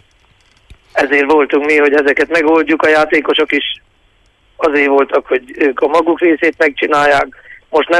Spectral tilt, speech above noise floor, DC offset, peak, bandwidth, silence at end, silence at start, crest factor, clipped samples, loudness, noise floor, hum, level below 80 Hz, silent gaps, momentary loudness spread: -4 dB/octave; 41 dB; under 0.1%; 0 dBFS; 11.5 kHz; 0 s; 0.95 s; 12 dB; under 0.1%; -12 LUFS; -53 dBFS; none; -50 dBFS; none; 7 LU